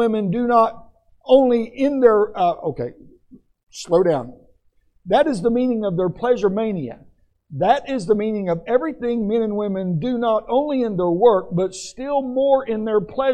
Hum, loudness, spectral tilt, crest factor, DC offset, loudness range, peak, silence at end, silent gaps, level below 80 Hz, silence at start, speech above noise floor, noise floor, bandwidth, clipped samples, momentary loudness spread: none; -19 LUFS; -7 dB/octave; 18 dB; under 0.1%; 3 LU; -2 dBFS; 0 s; 3.63-3.67 s; -52 dBFS; 0 s; 41 dB; -60 dBFS; 9.8 kHz; under 0.1%; 10 LU